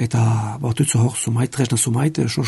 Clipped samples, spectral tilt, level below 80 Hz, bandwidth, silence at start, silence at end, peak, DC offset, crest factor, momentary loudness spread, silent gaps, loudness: under 0.1%; -5 dB/octave; -52 dBFS; 12 kHz; 0 s; 0 s; -4 dBFS; under 0.1%; 14 dB; 4 LU; none; -19 LUFS